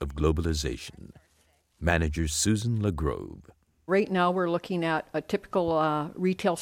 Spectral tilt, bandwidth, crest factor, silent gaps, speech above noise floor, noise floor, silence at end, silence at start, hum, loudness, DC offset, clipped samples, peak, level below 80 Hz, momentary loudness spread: -5 dB/octave; 16.5 kHz; 20 dB; none; 40 dB; -67 dBFS; 0 s; 0 s; none; -28 LUFS; under 0.1%; under 0.1%; -8 dBFS; -40 dBFS; 8 LU